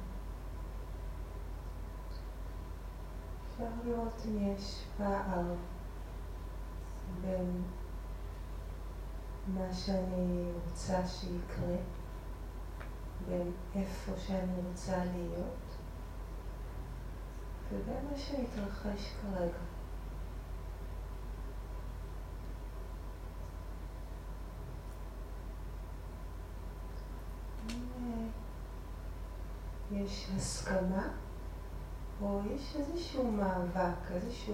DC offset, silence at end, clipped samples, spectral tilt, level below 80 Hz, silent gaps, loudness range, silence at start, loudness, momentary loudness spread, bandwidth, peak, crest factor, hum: under 0.1%; 0 s; under 0.1%; -6.5 dB/octave; -44 dBFS; none; 9 LU; 0 s; -41 LUFS; 11 LU; 16 kHz; -20 dBFS; 18 dB; none